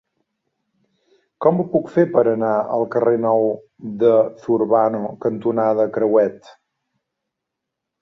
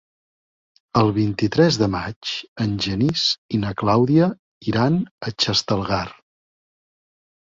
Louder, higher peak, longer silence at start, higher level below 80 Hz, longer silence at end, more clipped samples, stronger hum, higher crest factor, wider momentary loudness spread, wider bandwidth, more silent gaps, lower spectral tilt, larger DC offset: about the same, -18 LUFS vs -20 LUFS; about the same, -2 dBFS vs -2 dBFS; first, 1.4 s vs 0.95 s; second, -64 dBFS vs -48 dBFS; first, 1.5 s vs 1.3 s; neither; neither; about the same, 18 dB vs 20 dB; about the same, 7 LU vs 9 LU; second, 6.2 kHz vs 7.6 kHz; second, none vs 2.16-2.21 s, 2.48-2.56 s, 3.38-3.49 s, 4.39-4.61 s, 5.11-5.18 s; first, -9.5 dB/octave vs -5.5 dB/octave; neither